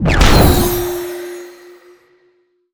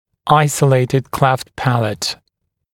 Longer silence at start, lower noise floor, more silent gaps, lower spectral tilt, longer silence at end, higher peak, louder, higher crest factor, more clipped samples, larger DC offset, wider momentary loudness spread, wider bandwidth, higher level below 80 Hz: second, 0 s vs 0.25 s; second, -58 dBFS vs -71 dBFS; neither; about the same, -5 dB/octave vs -5.5 dB/octave; first, 1.2 s vs 0.6 s; about the same, 0 dBFS vs 0 dBFS; first, -13 LUFS vs -16 LUFS; about the same, 14 dB vs 16 dB; neither; neither; first, 21 LU vs 8 LU; first, over 20 kHz vs 16.5 kHz; first, -20 dBFS vs -48 dBFS